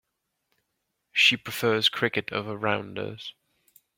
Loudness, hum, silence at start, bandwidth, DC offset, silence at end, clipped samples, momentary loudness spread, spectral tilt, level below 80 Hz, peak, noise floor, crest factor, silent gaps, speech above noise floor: -24 LUFS; none; 1.15 s; 16.5 kHz; under 0.1%; 0.65 s; under 0.1%; 16 LU; -3.5 dB/octave; -70 dBFS; -8 dBFS; -79 dBFS; 22 dB; none; 53 dB